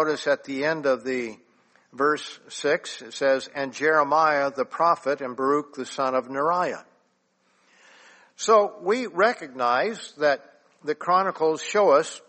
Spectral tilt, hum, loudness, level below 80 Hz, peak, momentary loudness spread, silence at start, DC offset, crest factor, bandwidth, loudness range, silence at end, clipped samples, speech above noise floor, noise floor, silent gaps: -3.5 dB/octave; none; -24 LUFS; -76 dBFS; -6 dBFS; 10 LU; 0 s; under 0.1%; 18 dB; 8.8 kHz; 4 LU; 0.1 s; under 0.1%; 44 dB; -68 dBFS; none